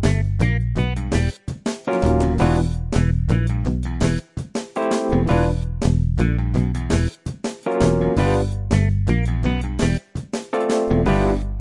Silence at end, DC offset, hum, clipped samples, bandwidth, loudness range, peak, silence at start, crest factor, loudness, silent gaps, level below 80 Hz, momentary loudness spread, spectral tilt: 0 s; under 0.1%; none; under 0.1%; 11.5 kHz; 1 LU; -4 dBFS; 0 s; 16 dB; -21 LUFS; none; -26 dBFS; 8 LU; -7 dB/octave